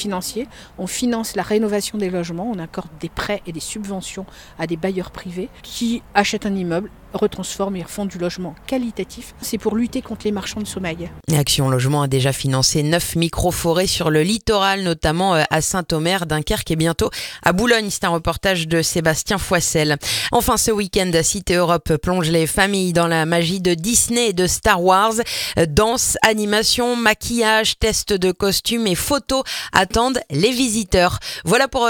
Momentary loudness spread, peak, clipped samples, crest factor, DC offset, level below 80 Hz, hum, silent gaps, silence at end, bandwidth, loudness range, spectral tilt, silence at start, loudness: 11 LU; 0 dBFS; under 0.1%; 18 dB; under 0.1%; -38 dBFS; none; none; 0 s; 19 kHz; 8 LU; -3.5 dB/octave; 0 s; -18 LUFS